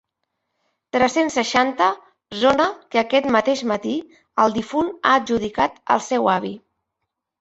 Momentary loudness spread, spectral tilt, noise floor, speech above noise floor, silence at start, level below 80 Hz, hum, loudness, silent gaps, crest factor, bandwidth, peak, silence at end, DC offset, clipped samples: 10 LU; -4 dB/octave; -80 dBFS; 60 dB; 0.95 s; -56 dBFS; none; -20 LUFS; none; 20 dB; 8.2 kHz; -2 dBFS; 0.85 s; under 0.1%; under 0.1%